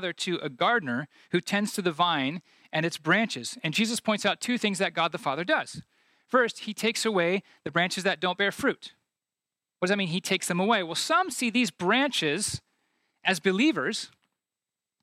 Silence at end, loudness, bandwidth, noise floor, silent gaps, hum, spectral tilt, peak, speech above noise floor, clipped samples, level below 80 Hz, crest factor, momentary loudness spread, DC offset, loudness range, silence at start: 0.95 s; -27 LUFS; 16 kHz; under -90 dBFS; none; none; -3.5 dB/octave; -8 dBFS; over 63 dB; under 0.1%; -70 dBFS; 20 dB; 7 LU; under 0.1%; 2 LU; 0 s